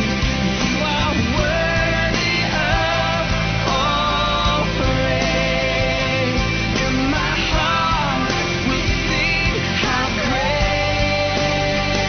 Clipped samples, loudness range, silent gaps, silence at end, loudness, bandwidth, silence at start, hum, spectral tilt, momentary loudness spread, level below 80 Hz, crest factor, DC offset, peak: under 0.1%; 0 LU; none; 0 s; -18 LUFS; 6.6 kHz; 0 s; none; -4.5 dB/octave; 2 LU; -28 dBFS; 14 dB; under 0.1%; -4 dBFS